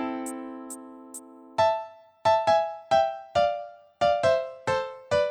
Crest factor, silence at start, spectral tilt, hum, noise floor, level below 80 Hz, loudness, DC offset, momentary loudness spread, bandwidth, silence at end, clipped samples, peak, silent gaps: 16 dB; 0 s; -4 dB/octave; none; -45 dBFS; -60 dBFS; -26 LUFS; under 0.1%; 19 LU; 15 kHz; 0 s; under 0.1%; -10 dBFS; none